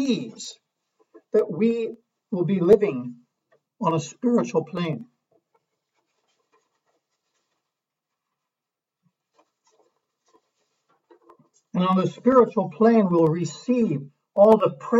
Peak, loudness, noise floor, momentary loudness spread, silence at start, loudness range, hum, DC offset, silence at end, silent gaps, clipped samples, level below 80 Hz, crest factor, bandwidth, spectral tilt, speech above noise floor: -4 dBFS; -22 LUFS; -87 dBFS; 15 LU; 0 s; 11 LU; none; under 0.1%; 0 s; none; under 0.1%; -66 dBFS; 20 dB; 7.8 kHz; -7 dB/octave; 66 dB